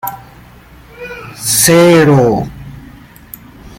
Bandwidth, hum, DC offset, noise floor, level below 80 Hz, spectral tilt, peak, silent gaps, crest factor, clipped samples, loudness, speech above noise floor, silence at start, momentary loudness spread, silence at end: 17 kHz; none; under 0.1%; -38 dBFS; -40 dBFS; -4.5 dB/octave; 0 dBFS; none; 14 dB; under 0.1%; -9 LUFS; 30 dB; 0.05 s; 26 LU; 0.1 s